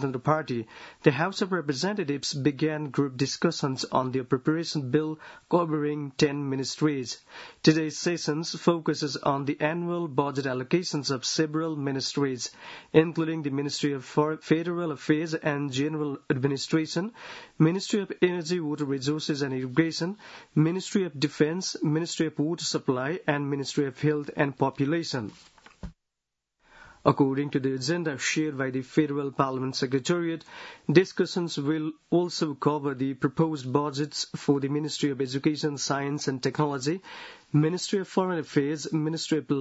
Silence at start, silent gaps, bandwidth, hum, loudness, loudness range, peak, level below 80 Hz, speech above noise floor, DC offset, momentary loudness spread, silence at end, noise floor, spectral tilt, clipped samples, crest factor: 0 s; none; 8 kHz; none; -28 LUFS; 2 LU; -4 dBFS; -64 dBFS; 58 dB; under 0.1%; 6 LU; 0 s; -85 dBFS; -5.5 dB/octave; under 0.1%; 24 dB